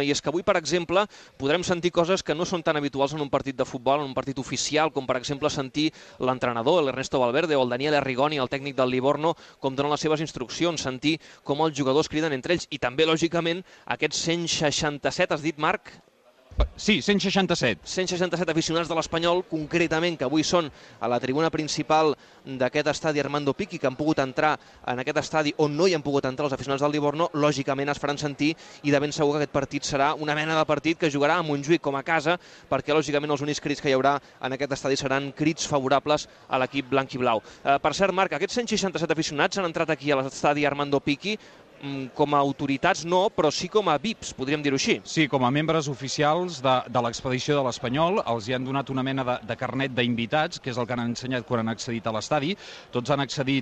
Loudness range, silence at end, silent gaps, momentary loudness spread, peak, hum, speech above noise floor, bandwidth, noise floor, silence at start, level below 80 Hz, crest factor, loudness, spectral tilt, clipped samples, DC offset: 2 LU; 0 s; none; 6 LU; -8 dBFS; none; 26 dB; 9 kHz; -52 dBFS; 0 s; -48 dBFS; 18 dB; -25 LUFS; -4.5 dB/octave; under 0.1%; under 0.1%